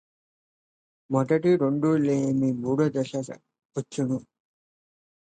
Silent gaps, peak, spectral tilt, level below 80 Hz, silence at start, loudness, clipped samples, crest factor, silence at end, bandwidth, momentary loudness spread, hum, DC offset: 3.65-3.69 s; -10 dBFS; -7.5 dB/octave; -68 dBFS; 1.1 s; -25 LUFS; under 0.1%; 16 dB; 1 s; 9.2 kHz; 13 LU; none; under 0.1%